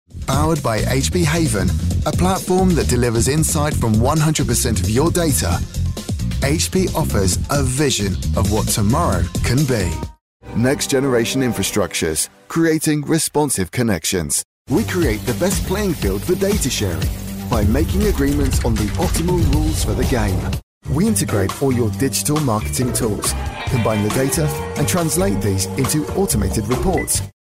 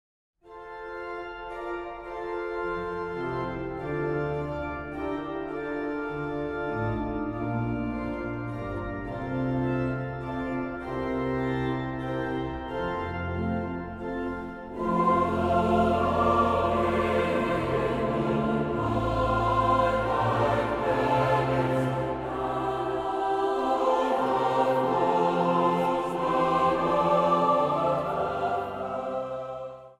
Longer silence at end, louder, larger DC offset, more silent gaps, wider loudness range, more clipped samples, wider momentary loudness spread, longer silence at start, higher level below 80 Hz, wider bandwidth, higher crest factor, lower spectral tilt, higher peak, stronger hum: about the same, 0.1 s vs 0.05 s; first, -18 LUFS vs -27 LUFS; neither; first, 10.21-10.40 s, 14.45-14.65 s, 20.63-20.81 s vs none; second, 2 LU vs 7 LU; neither; second, 5 LU vs 11 LU; second, 0.15 s vs 0.45 s; first, -28 dBFS vs -46 dBFS; first, 16 kHz vs 14 kHz; about the same, 12 dB vs 16 dB; second, -5 dB/octave vs -7.5 dB/octave; first, -6 dBFS vs -12 dBFS; neither